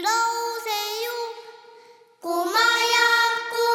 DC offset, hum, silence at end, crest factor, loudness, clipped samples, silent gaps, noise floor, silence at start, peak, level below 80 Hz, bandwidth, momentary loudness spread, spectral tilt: under 0.1%; none; 0 s; 18 dB; -21 LUFS; under 0.1%; none; -51 dBFS; 0 s; -6 dBFS; -84 dBFS; 18 kHz; 15 LU; 1 dB/octave